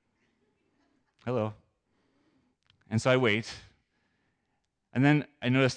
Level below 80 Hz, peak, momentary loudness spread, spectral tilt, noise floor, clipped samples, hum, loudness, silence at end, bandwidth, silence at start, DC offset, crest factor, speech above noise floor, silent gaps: -70 dBFS; -10 dBFS; 16 LU; -6 dB/octave; -79 dBFS; under 0.1%; none; -28 LUFS; 0 s; 9.8 kHz; 1.25 s; under 0.1%; 20 dB; 52 dB; none